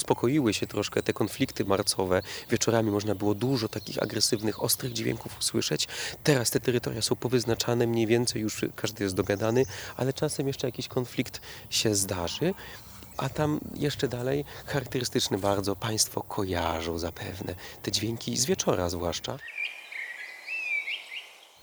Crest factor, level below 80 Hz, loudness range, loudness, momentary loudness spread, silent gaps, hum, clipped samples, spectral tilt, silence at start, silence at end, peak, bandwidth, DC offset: 22 dB; -54 dBFS; 3 LU; -29 LUFS; 9 LU; none; none; under 0.1%; -4 dB/octave; 0 s; 0.25 s; -6 dBFS; over 20 kHz; under 0.1%